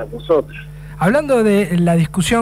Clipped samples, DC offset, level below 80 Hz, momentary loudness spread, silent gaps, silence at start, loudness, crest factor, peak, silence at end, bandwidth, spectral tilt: under 0.1%; 0.2%; -38 dBFS; 17 LU; none; 0 s; -16 LUFS; 12 dB; -4 dBFS; 0 s; 15 kHz; -6 dB/octave